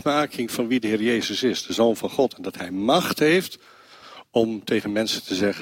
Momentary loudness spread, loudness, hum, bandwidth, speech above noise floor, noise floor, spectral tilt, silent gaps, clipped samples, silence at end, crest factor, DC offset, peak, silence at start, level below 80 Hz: 7 LU; -23 LUFS; none; 16.5 kHz; 23 dB; -46 dBFS; -4.5 dB/octave; none; under 0.1%; 0 s; 18 dB; under 0.1%; -6 dBFS; 0.05 s; -62 dBFS